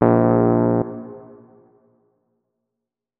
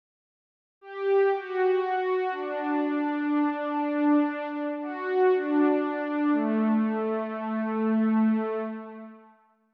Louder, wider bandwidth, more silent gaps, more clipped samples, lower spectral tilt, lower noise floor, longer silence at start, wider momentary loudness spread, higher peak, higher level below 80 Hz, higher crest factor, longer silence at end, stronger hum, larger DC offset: first, -18 LUFS vs -26 LUFS; second, 2.9 kHz vs 5 kHz; neither; neither; first, -14 dB/octave vs -9 dB/octave; first, -84 dBFS vs -59 dBFS; second, 0 s vs 0.85 s; first, 23 LU vs 8 LU; first, 0 dBFS vs -14 dBFS; first, -50 dBFS vs -84 dBFS; first, 20 dB vs 12 dB; first, 2 s vs 0.55 s; neither; neither